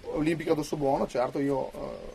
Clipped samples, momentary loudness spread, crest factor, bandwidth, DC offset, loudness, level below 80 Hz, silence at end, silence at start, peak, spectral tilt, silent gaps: under 0.1%; 6 LU; 18 dB; 13.5 kHz; under 0.1%; -29 LUFS; -50 dBFS; 0 s; 0 s; -12 dBFS; -6.5 dB/octave; none